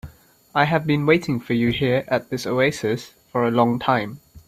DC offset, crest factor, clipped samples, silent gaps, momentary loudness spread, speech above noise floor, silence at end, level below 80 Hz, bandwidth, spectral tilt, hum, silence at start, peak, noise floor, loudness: under 0.1%; 20 dB; under 0.1%; none; 7 LU; 23 dB; 0.1 s; -52 dBFS; 15 kHz; -6.5 dB/octave; none; 0.05 s; -2 dBFS; -44 dBFS; -21 LUFS